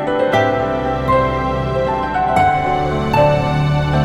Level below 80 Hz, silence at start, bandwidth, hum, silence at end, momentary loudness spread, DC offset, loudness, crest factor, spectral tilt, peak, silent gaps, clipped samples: -32 dBFS; 0 s; 13 kHz; none; 0 s; 4 LU; under 0.1%; -16 LUFS; 14 dB; -7 dB/octave; -2 dBFS; none; under 0.1%